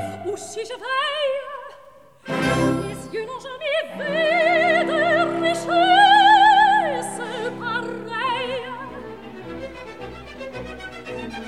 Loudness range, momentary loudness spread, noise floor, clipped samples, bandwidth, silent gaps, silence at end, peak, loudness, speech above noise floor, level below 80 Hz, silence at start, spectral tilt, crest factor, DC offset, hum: 13 LU; 22 LU; -48 dBFS; under 0.1%; 13.5 kHz; none; 0 s; -4 dBFS; -19 LUFS; 23 dB; -52 dBFS; 0 s; -4 dB/octave; 16 dB; 0.2%; none